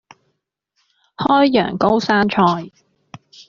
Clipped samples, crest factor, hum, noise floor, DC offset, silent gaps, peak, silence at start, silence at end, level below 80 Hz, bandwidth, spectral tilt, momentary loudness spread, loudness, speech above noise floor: under 0.1%; 16 dB; none; -72 dBFS; under 0.1%; none; -2 dBFS; 1.2 s; 0.8 s; -54 dBFS; 7.4 kHz; -4 dB/octave; 11 LU; -16 LUFS; 56 dB